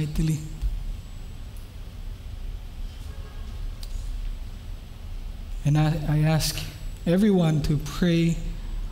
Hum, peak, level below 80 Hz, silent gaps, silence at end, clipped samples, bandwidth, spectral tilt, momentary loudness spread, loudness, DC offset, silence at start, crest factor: none; -12 dBFS; -34 dBFS; none; 0 s; under 0.1%; 16 kHz; -6.5 dB/octave; 19 LU; -25 LUFS; under 0.1%; 0 s; 14 dB